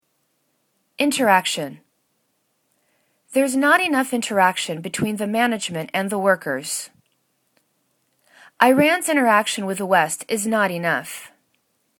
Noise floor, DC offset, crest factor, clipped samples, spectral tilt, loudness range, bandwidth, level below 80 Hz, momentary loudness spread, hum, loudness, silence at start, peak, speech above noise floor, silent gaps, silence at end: -69 dBFS; under 0.1%; 22 dB; under 0.1%; -3.5 dB/octave; 5 LU; 19 kHz; -70 dBFS; 10 LU; none; -20 LUFS; 1 s; 0 dBFS; 50 dB; none; 0.7 s